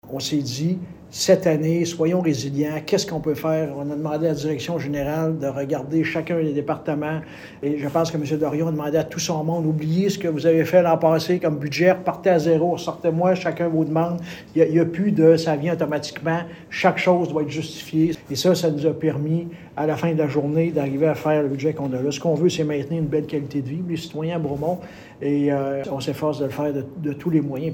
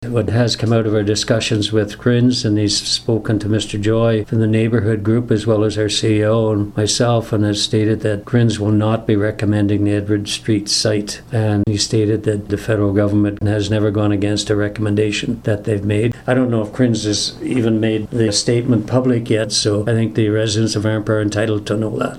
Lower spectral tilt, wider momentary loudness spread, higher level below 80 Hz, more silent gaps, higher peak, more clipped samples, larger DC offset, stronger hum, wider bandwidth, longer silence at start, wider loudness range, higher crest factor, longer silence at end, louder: about the same, -6 dB/octave vs -5.5 dB/octave; first, 9 LU vs 4 LU; second, -56 dBFS vs -42 dBFS; neither; about the same, -4 dBFS vs -2 dBFS; neither; neither; neither; first, 17.5 kHz vs 12.5 kHz; about the same, 0.05 s vs 0 s; first, 5 LU vs 1 LU; about the same, 18 dB vs 14 dB; about the same, 0 s vs 0 s; second, -22 LUFS vs -17 LUFS